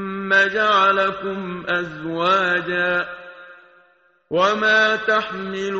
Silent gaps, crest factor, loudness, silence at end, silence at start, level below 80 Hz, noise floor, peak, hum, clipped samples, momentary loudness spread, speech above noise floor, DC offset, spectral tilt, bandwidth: none; 16 dB; -19 LUFS; 0 s; 0 s; -60 dBFS; -58 dBFS; -4 dBFS; none; under 0.1%; 12 LU; 39 dB; under 0.1%; -1.5 dB/octave; 7.8 kHz